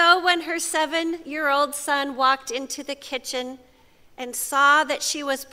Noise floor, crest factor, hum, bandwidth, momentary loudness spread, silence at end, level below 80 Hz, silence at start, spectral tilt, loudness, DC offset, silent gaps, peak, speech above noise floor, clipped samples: -54 dBFS; 20 dB; none; 16 kHz; 14 LU; 0.1 s; -64 dBFS; 0 s; 0.5 dB/octave; -22 LUFS; under 0.1%; none; -4 dBFS; 30 dB; under 0.1%